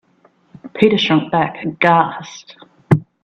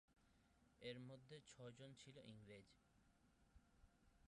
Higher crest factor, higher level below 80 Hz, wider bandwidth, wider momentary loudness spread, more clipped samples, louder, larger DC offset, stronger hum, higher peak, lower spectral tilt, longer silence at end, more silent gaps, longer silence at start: about the same, 18 dB vs 20 dB; first, -52 dBFS vs -82 dBFS; second, 8 kHz vs 11 kHz; first, 20 LU vs 7 LU; neither; first, -16 LUFS vs -61 LUFS; neither; neither; first, 0 dBFS vs -42 dBFS; first, -6.5 dB/octave vs -5 dB/octave; first, 0.2 s vs 0 s; neither; first, 0.65 s vs 0.1 s